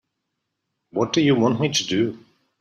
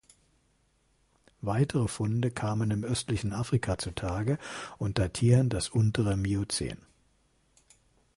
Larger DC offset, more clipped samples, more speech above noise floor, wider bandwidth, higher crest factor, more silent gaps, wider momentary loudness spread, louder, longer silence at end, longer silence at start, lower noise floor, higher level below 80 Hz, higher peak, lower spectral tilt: neither; neither; first, 58 dB vs 41 dB; first, 13.5 kHz vs 11.5 kHz; about the same, 16 dB vs 20 dB; neither; about the same, 8 LU vs 9 LU; first, -21 LUFS vs -30 LUFS; second, 0.45 s vs 1.4 s; second, 0.95 s vs 1.45 s; first, -79 dBFS vs -70 dBFS; second, -62 dBFS vs -48 dBFS; first, -6 dBFS vs -10 dBFS; about the same, -5 dB/octave vs -6 dB/octave